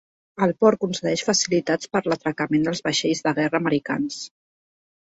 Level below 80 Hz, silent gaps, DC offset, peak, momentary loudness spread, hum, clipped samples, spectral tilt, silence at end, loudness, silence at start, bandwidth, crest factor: -62 dBFS; none; under 0.1%; -4 dBFS; 7 LU; none; under 0.1%; -4 dB/octave; 0.85 s; -22 LUFS; 0.35 s; 8.2 kHz; 18 dB